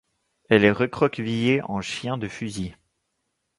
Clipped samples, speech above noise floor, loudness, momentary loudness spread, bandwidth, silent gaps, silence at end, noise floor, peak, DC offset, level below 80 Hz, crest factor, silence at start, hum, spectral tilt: under 0.1%; 54 dB; -23 LUFS; 13 LU; 11.5 kHz; none; 0.85 s; -77 dBFS; -2 dBFS; under 0.1%; -54 dBFS; 22 dB; 0.5 s; none; -6 dB/octave